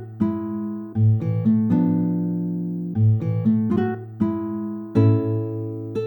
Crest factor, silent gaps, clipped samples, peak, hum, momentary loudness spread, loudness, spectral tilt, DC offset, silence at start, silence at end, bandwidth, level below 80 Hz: 14 dB; none; under 0.1%; -6 dBFS; none; 9 LU; -22 LUFS; -11.5 dB/octave; under 0.1%; 0 s; 0 s; 4.2 kHz; -60 dBFS